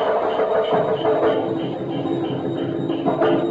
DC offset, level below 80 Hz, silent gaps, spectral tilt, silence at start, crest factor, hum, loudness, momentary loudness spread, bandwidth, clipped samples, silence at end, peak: under 0.1%; -58 dBFS; none; -8 dB/octave; 0 s; 14 dB; none; -21 LUFS; 6 LU; 7.6 kHz; under 0.1%; 0 s; -8 dBFS